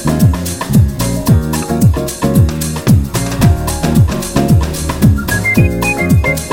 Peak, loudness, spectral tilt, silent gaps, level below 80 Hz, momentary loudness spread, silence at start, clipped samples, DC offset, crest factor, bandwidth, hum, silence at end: 0 dBFS; -12 LUFS; -6 dB/octave; none; -22 dBFS; 4 LU; 0 s; under 0.1%; under 0.1%; 12 dB; 17 kHz; none; 0 s